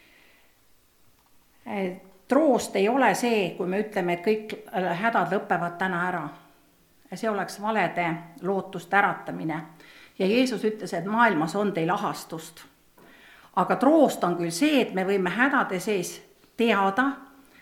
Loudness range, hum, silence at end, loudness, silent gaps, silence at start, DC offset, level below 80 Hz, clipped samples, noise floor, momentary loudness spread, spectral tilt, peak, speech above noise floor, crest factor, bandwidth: 4 LU; none; 0.35 s; -25 LUFS; none; 1.65 s; under 0.1%; -70 dBFS; under 0.1%; -61 dBFS; 12 LU; -5 dB/octave; -6 dBFS; 37 dB; 20 dB; 18 kHz